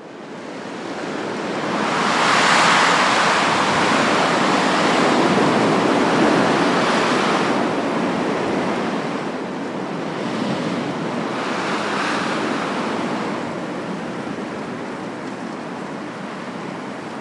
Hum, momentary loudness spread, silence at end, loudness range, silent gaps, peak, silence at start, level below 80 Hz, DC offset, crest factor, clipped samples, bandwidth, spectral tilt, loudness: none; 14 LU; 0 s; 11 LU; none; -4 dBFS; 0 s; -60 dBFS; under 0.1%; 16 dB; under 0.1%; 11.5 kHz; -4 dB/octave; -19 LUFS